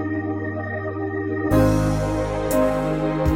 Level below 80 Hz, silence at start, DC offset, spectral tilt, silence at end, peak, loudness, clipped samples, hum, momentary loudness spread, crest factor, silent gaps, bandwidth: -32 dBFS; 0 s; under 0.1%; -7 dB/octave; 0 s; -6 dBFS; -22 LUFS; under 0.1%; none; 9 LU; 14 dB; none; 16.5 kHz